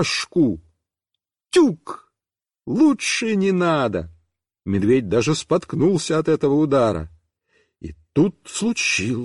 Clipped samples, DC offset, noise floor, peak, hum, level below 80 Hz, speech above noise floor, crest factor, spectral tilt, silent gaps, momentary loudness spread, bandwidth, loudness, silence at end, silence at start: under 0.1%; under 0.1%; under -90 dBFS; -6 dBFS; none; -50 dBFS; over 71 dB; 14 dB; -5 dB/octave; none; 19 LU; 11.5 kHz; -20 LUFS; 0 s; 0 s